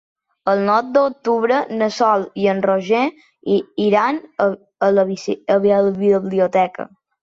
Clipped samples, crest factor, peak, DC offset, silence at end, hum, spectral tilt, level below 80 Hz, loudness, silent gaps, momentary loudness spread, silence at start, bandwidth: under 0.1%; 14 dB; -4 dBFS; under 0.1%; 0.4 s; none; -6.5 dB/octave; -62 dBFS; -18 LUFS; none; 6 LU; 0.45 s; 7.6 kHz